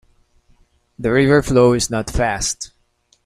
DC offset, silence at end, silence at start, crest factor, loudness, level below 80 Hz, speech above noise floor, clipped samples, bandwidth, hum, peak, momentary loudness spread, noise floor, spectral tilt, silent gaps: under 0.1%; 0.6 s; 1 s; 16 dB; -17 LUFS; -34 dBFS; 45 dB; under 0.1%; 15 kHz; none; -2 dBFS; 12 LU; -61 dBFS; -5 dB/octave; none